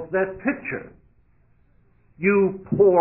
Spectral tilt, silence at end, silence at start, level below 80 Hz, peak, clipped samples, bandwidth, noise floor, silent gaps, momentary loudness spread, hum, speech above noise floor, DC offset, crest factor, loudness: -13 dB/octave; 0 s; 0 s; -54 dBFS; -4 dBFS; under 0.1%; 3 kHz; -60 dBFS; none; 12 LU; none; 40 dB; under 0.1%; 18 dB; -23 LUFS